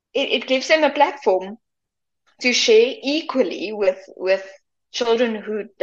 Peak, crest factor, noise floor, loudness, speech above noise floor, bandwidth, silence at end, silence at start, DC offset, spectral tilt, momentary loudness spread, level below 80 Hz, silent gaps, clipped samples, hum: -2 dBFS; 18 dB; -83 dBFS; -19 LUFS; 63 dB; 7.8 kHz; 0.15 s; 0.15 s; under 0.1%; -2 dB/octave; 11 LU; -70 dBFS; none; under 0.1%; none